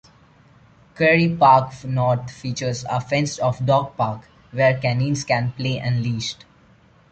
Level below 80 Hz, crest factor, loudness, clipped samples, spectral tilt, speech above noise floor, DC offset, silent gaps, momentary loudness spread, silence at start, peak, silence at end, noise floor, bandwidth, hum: -52 dBFS; 18 dB; -20 LUFS; under 0.1%; -5.5 dB/octave; 33 dB; under 0.1%; none; 12 LU; 0.95 s; -2 dBFS; 0.8 s; -53 dBFS; 8.8 kHz; none